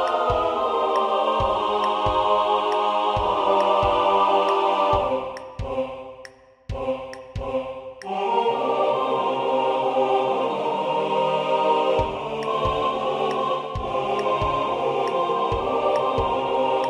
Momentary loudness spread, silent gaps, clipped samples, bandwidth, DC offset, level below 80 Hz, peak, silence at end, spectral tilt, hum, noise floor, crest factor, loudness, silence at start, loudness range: 9 LU; none; under 0.1%; 10.5 kHz; under 0.1%; -42 dBFS; -8 dBFS; 0 s; -5.5 dB/octave; none; -46 dBFS; 14 dB; -22 LUFS; 0 s; 6 LU